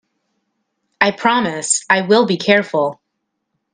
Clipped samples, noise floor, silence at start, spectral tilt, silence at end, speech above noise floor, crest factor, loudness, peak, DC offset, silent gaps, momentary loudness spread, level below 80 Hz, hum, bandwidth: under 0.1%; -74 dBFS; 1 s; -3 dB/octave; 0.8 s; 59 dB; 18 dB; -15 LUFS; 0 dBFS; under 0.1%; none; 6 LU; -62 dBFS; none; 10 kHz